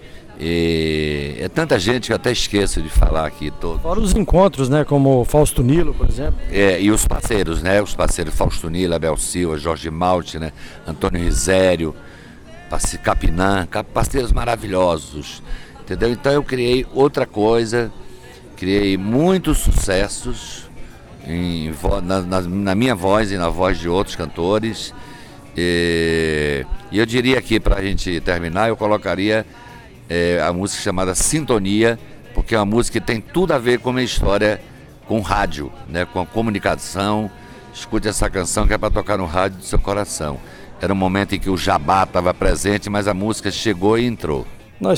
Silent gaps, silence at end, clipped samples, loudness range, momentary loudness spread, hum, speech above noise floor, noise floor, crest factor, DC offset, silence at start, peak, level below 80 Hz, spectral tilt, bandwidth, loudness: none; 0 s; under 0.1%; 4 LU; 11 LU; none; 20 dB; -38 dBFS; 16 dB; under 0.1%; 0 s; -2 dBFS; -26 dBFS; -5 dB/octave; 18.5 kHz; -19 LUFS